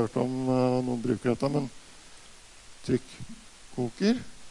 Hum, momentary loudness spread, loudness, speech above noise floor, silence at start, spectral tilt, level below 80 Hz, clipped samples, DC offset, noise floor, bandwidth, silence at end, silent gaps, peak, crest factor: none; 23 LU; -29 LUFS; 22 dB; 0 s; -6.5 dB/octave; -56 dBFS; under 0.1%; under 0.1%; -50 dBFS; 11.5 kHz; 0 s; none; -12 dBFS; 18 dB